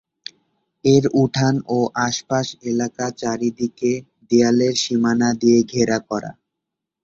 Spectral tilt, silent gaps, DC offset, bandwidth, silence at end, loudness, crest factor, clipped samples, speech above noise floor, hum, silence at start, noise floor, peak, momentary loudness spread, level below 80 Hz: -5 dB/octave; none; under 0.1%; 7.8 kHz; 0.7 s; -19 LUFS; 18 dB; under 0.1%; 64 dB; none; 0.85 s; -82 dBFS; -2 dBFS; 12 LU; -56 dBFS